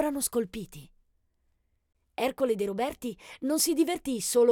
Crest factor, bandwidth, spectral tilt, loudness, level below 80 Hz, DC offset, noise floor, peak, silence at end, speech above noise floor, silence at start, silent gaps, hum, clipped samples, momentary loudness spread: 18 dB; 19 kHz; -3 dB/octave; -29 LUFS; -60 dBFS; under 0.1%; -73 dBFS; -12 dBFS; 0 s; 45 dB; 0 s; none; none; under 0.1%; 14 LU